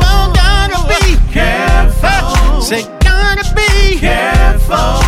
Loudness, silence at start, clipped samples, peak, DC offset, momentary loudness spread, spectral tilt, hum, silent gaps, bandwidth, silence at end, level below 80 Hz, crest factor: -11 LUFS; 0 s; 0.2%; 0 dBFS; under 0.1%; 2 LU; -4.5 dB/octave; none; none; 15 kHz; 0 s; -10 dBFS; 8 dB